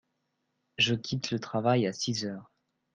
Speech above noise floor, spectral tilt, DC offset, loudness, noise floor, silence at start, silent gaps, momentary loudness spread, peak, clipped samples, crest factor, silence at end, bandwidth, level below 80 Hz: 49 dB; -4.5 dB/octave; under 0.1%; -29 LUFS; -79 dBFS; 0.8 s; none; 12 LU; -12 dBFS; under 0.1%; 20 dB; 0.5 s; 9.4 kHz; -68 dBFS